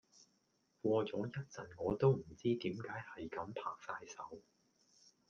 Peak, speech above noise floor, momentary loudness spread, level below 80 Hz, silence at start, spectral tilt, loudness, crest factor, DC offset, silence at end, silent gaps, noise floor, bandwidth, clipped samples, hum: -20 dBFS; 39 dB; 16 LU; -70 dBFS; 0.2 s; -7 dB/octave; -40 LUFS; 22 dB; under 0.1%; 0.9 s; none; -79 dBFS; 7.2 kHz; under 0.1%; none